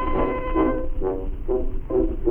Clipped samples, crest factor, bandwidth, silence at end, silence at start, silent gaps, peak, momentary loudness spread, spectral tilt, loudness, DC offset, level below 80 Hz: under 0.1%; 14 dB; 3.3 kHz; 0 s; 0 s; none; -8 dBFS; 5 LU; -10 dB/octave; -25 LUFS; under 0.1%; -26 dBFS